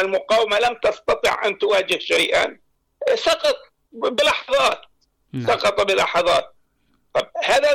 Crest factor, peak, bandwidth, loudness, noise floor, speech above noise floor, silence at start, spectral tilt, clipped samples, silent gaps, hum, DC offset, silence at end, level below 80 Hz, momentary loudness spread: 10 dB; -10 dBFS; 16.5 kHz; -19 LUFS; -65 dBFS; 45 dB; 0 s; -2.5 dB/octave; under 0.1%; none; none; under 0.1%; 0 s; -52 dBFS; 8 LU